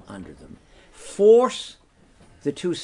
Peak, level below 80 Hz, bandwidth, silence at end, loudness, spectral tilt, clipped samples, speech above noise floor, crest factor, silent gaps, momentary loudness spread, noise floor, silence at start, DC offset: -4 dBFS; -56 dBFS; 11 kHz; 0 s; -19 LUFS; -5 dB/octave; under 0.1%; 32 dB; 18 dB; none; 24 LU; -54 dBFS; 0.1 s; under 0.1%